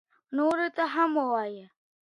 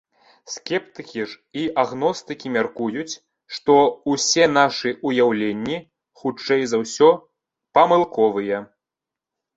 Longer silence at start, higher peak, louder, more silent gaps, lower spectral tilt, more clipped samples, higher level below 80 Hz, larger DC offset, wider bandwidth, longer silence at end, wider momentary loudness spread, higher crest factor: second, 0.3 s vs 0.5 s; second, -12 dBFS vs -2 dBFS; second, -28 LUFS vs -20 LUFS; neither; first, -5 dB/octave vs -3.5 dB/octave; neither; second, -78 dBFS vs -64 dBFS; neither; first, 11.5 kHz vs 8 kHz; second, 0.5 s vs 0.9 s; second, 11 LU vs 14 LU; about the same, 16 dB vs 20 dB